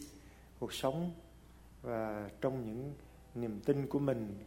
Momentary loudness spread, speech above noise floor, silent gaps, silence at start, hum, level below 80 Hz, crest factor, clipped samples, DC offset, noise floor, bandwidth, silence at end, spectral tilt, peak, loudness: 18 LU; 20 dB; none; 0 s; none; -60 dBFS; 22 dB; under 0.1%; under 0.1%; -58 dBFS; 16 kHz; 0 s; -6.5 dB/octave; -18 dBFS; -39 LUFS